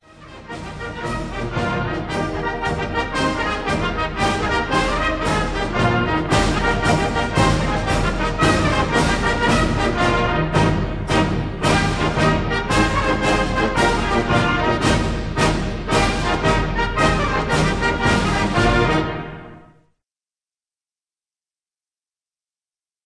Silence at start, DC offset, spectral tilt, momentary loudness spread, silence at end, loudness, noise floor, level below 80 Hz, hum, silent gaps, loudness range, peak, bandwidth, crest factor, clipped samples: 0.2 s; 0.2%; -5 dB/octave; 6 LU; 3.45 s; -19 LUFS; under -90 dBFS; -28 dBFS; none; none; 4 LU; -2 dBFS; 11 kHz; 16 dB; under 0.1%